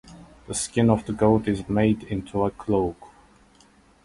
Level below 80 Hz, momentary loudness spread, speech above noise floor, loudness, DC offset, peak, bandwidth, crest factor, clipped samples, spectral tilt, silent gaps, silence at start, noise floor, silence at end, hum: -46 dBFS; 8 LU; 33 dB; -24 LUFS; under 0.1%; -6 dBFS; 11.5 kHz; 20 dB; under 0.1%; -6 dB/octave; none; 0.05 s; -56 dBFS; 0.95 s; none